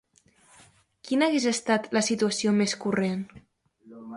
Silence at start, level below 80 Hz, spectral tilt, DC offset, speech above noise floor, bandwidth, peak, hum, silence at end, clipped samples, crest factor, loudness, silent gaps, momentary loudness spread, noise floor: 1.05 s; -68 dBFS; -4 dB/octave; under 0.1%; 36 dB; 11.5 kHz; -10 dBFS; none; 0 s; under 0.1%; 18 dB; -25 LUFS; none; 9 LU; -61 dBFS